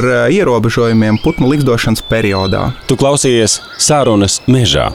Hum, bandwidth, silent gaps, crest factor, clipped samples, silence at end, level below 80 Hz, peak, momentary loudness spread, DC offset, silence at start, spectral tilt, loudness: none; 17.5 kHz; none; 10 dB; under 0.1%; 0 s; -32 dBFS; -2 dBFS; 4 LU; 0.8%; 0 s; -4.5 dB/octave; -11 LUFS